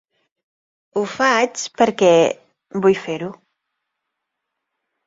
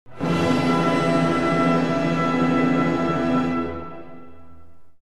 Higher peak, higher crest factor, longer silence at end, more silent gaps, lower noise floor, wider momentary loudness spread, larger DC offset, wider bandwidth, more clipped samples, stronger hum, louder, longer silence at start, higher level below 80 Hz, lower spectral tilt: first, -2 dBFS vs -8 dBFS; about the same, 18 dB vs 14 dB; first, 1.75 s vs 0 s; neither; first, -79 dBFS vs -50 dBFS; first, 15 LU vs 8 LU; second, under 0.1% vs 1%; second, 7.8 kHz vs 11.5 kHz; neither; neither; first, -18 LUFS vs -21 LUFS; first, 0.95 s vs 0.05 s; second, -64 dBFS vs -50 dBFS; second, -4 dB/octave vs -7 dB/octave